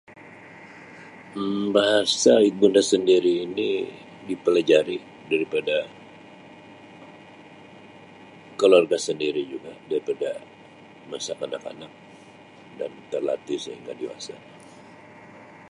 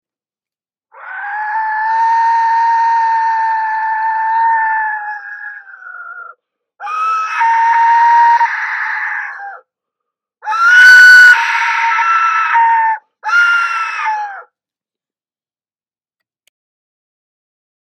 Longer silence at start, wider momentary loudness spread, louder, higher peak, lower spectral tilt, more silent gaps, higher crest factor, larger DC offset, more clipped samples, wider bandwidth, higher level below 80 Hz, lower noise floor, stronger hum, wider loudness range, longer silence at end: second, 0.1 s vs 0.95 s; first, 25 LU vs 22 LU; second, -23 LUFS vs -10 LUFS; second, -4 dBFS vs 0 dBFS; first, -3.5 dB/octave vs 3 dB/octave; neither; first, 22 dB vs 14 dB; neither; second, under 0.1% vs 0.1%; second, 11.5 kHz vs 17.5 kHz; about the same, -70 dBFS vs -68 dBFS; second, -48 dBFS vs under -90 dBFS; neither; about the same, 13 LU vs 11 LU; second, 0.25 s vs 3.45 s